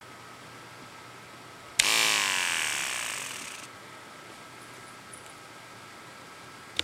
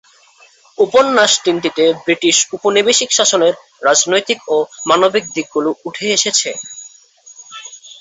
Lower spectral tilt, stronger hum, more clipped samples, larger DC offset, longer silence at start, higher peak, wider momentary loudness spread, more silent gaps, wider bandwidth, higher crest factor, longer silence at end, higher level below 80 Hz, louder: second, 0.5 dB/octave vs -1.5 dB/octave; neither; neither; neither; second, 0 s vs 0.8 s; about the same, -2 dBFS vs 0 dBFS; first, 23 LU vs 17 LU; neither; first, 16 kHz vs 8.4 kHz; first, 32 dB vs 14 dB; about the same, 0 s vs 0.1 s; second, -70 dBFS vs -62 dBFS; second, -26 LUFS vs -13 LUFS